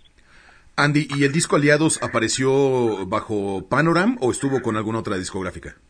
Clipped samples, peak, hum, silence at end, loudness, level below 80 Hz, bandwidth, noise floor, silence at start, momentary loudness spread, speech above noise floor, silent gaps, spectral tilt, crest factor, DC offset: under 0.1%; -2 dBFS; none; 0.15 s; -20 LUFS; -52 dBFS; 11 kHz; -51 dBFS; 0.8 s; 9 LU; 30 dB; none; -5 dB/octave; 18 dB; under 0.1%